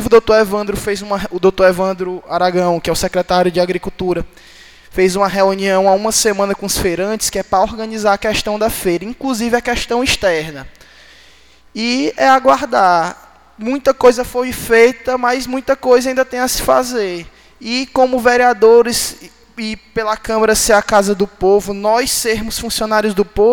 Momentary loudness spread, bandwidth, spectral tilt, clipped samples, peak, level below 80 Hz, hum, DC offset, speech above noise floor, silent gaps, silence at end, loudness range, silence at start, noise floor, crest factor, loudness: 10 LU; 19 kHz; -3.5 dB/octave; under 0.1%; 0 dBFS; -38 dBFS; none; 0.4%; 33 dB; none; 0 s; 3 LU; 0 s; -47 dBFS; 14 dB; -14 LUFS